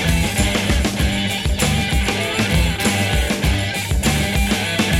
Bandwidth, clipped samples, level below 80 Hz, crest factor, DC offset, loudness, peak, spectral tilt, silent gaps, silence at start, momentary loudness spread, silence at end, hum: 16.5 kHz; under 0.1%; -24 dBFS; 16 dB; under 0.1%; -18 LUFS; -2 dBFS; -4 dB/octave; none; 0 s; 2 LU; 0 s; none